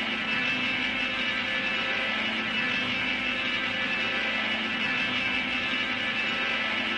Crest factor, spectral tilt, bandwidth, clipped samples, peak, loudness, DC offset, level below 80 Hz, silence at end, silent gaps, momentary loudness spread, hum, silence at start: 14 dB; -3 dB/octave; 11 kHz; under 0.1%; -14 dBFS; -26 LUFS; under 0.1%; -58 dBFS; 0 s; none; 1 LU; none; 0 s